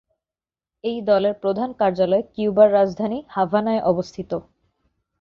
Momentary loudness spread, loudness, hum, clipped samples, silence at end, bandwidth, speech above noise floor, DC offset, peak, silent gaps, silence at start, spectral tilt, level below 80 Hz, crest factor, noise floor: 13 LU; -21 LUFS; none; under 0.1%; 0.8 s; 7 kHz; over 70 dB; under 0.1%; -2 dBFS; none; 0.85 s; -7.5 dB/octave; -58 dBFS; 18 dB; under -90 dBFS